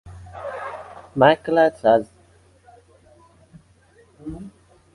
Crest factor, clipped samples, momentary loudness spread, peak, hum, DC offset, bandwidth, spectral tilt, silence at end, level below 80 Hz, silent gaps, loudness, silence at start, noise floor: 22 dB; under 0.1%; 23 LU; -2 dBFS; none; under 0.1%; 11.5 kHz; -7 dB/octave; 0.45 s; -54 dBFS; none; -19 LUFS; 0.05 s; -55 dBFS